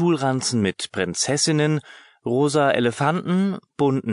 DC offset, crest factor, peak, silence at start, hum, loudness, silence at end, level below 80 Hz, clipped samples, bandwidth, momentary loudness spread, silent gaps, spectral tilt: under 0.1%; 16 dB; -6 dBFS; 0 s; none; -21 LUFS; 0 s; -56 dBFS; under 0.1%; 11 kHz; 7 LU; none; -4.5 dB/octave